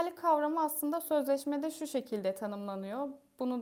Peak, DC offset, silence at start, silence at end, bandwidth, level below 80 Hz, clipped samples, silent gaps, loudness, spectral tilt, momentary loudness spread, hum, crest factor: -16 dBFS; under 0.1%; 0 s; 0 s; over 20 kHz; -82 dBFS; under 0.1%; none; -34 LUFS; -4.5 dB/octave; 9 LU; none; 16 dB